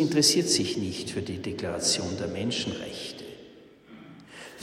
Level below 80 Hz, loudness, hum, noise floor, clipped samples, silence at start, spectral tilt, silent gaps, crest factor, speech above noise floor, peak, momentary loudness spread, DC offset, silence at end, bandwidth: -60 dBFS; -27 LUFS; none; -51 dBFS; under 0.1%; 0 s; -3 dB/octave; none; 20 dB; 23 dB; -8 dBFS; 24 LU; under 0.1%; 0 s; 16 kHz